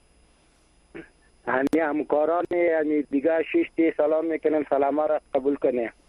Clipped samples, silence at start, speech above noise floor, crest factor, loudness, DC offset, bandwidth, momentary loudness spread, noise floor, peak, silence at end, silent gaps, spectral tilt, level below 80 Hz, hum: under 0.1%; 0.95 s; 37 dB; 16 dB; -24 LUFS; under 0.1%; 10.5 kHz; 4 LU; -60 dBFS; -10 dBFS; 0.2 s; none; -7 dB/octave; -62 dBFS; none